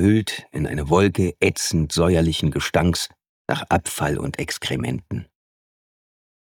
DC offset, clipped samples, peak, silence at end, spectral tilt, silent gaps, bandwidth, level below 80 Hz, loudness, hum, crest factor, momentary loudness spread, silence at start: under 0.1%; under 0.1%; -4 dBFS; 1.25 s; -5 dB/octave; 3.29-3.45 s; 19 kHz; -40 dBFS; -22 LUFS; none; 18 dB; 10 LU; 0 s